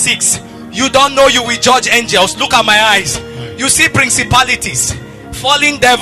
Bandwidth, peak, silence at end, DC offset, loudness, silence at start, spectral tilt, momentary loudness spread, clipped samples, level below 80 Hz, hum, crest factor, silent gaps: 14 kHz; 0 dBFS; 0 s; under 0.1%; -10 LUFS; 0 s; -1.5 dB/octave; 10 LU; 0.1%; -36 dBFS; none; 12 dB; none